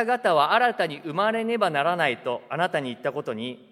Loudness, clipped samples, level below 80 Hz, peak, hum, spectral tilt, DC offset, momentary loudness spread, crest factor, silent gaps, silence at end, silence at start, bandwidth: -24 LUFS; under 0.1%; -80 dBFS; -6 dBFS; none; -5 dB/octave; under 0.1%; 10 LU; 18 dB; none; 0.15 s; 0 s; 13 kHz